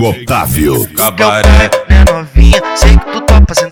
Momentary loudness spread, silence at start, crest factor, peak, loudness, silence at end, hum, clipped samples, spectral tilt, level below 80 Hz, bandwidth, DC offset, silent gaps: 5 LU; 0 s; 6 dB; 0 dBFS; -8 LUFS; 0 s; none; 3%; -5 dB/octave; -8 dBFS; 19 kHz; under 0.1%; none